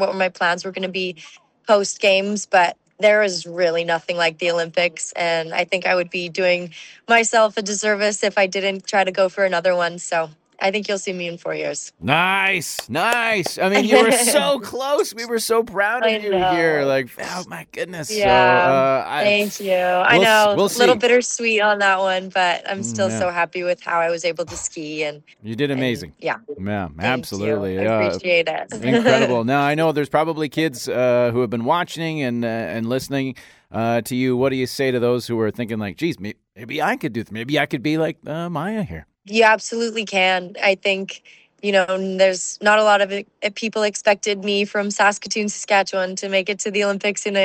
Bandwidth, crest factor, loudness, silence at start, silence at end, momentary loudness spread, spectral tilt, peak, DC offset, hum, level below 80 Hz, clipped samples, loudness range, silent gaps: 17 kHz; 18 dB; -19 LUFS; 0 s; 0 s; 11 LU; -3.5 dB/octave; 0 dBFS; under 0.1%; none; -56 dBFS; under 0.1%; 7 LU; none